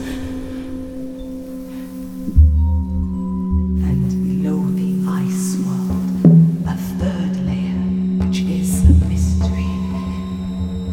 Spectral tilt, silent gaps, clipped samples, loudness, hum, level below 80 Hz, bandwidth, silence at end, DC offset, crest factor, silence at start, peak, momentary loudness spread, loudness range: -7.5 dB/octave; none; under 0.1%; -18 LUFS; none; -24 dBFS; 15.5 kHz; 0 s; under 0.1%; 16 dB; 0 s; 0 dBFS; 16 LU; 3 LU